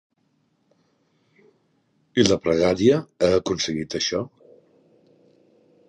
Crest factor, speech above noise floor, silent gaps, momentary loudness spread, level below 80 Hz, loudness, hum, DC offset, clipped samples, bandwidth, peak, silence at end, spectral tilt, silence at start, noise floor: 22 dB; 47 dB; none; 8 LU; -52 dBFS; -21 LUFS; none; under 0.1%; under 0.1%; 10.5 kHz; -2 dBFS; 1.6 s; -4.5 dB/octave; 2.15 s; -68 dBFS